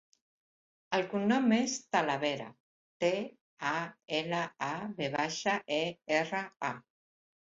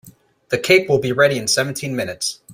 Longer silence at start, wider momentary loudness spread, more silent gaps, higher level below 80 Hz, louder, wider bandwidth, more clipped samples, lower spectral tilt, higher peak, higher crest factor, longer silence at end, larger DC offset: first, 0.9 s vs 0.05 s; about the same, 9 LU vs 10 LU; first, 2.60-3.00 s, 3.41-3.57 s vs none; second, -76 dBFS vs -56 dBFS; second, -33 LUFS vs -18 LUFS; second, 7.8 kHz vs 16 kHz; neither; about the same, -4 dB/octave vs -3.5 dB/octave; second, -12 dBFS vs -2 dBFS; about the same, 22 dB vs 18 dB; first, 0.75 s vs 0 s; neither